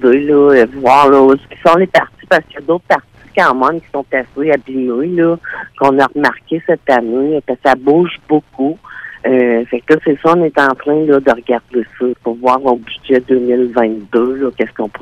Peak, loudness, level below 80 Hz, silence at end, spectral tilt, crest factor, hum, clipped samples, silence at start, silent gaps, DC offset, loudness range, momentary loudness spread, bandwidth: 0 dBFS; -13 LUFS; -48 dBFS; 0.05 s; -6.5 dB/octave; 12 dB; none; 0.3%; 0 s; none; under 0.1%; 3 LU; 10 LU; 11 kHz